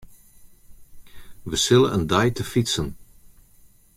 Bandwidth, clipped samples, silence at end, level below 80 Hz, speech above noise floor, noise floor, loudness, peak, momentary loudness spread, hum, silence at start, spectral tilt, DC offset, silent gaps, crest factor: 16 kHz; under 0.1%; 0.95 s; -46 dBFS; 32 dB; -53 dBFS; -21 LUFS; -2 dBFS; 12 LU; none; 0.05 s; -4.5 dB/octave; under 0.1%; none; 22 dB